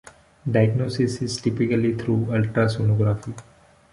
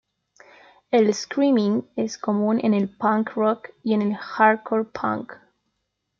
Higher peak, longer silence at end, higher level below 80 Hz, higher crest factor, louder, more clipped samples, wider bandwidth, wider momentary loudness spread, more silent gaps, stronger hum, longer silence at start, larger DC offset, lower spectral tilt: second, -6 dBFS vs -2 dBFS; second, 0.5 s vs 0.85 s; first, -50 dBFS vs -70 dBFS; about the same, 18 dB vs 20 dB; about the same, -22 LUFS vs -22 LUFS; neither; first, 11 kHz vs 7.4 kHz; about the same, 8 LU vs 8 LU; neither; neither; second, 0.45 s vs 0.9 s; neither; about the same, -7 dB/octave vs -6 dB/octave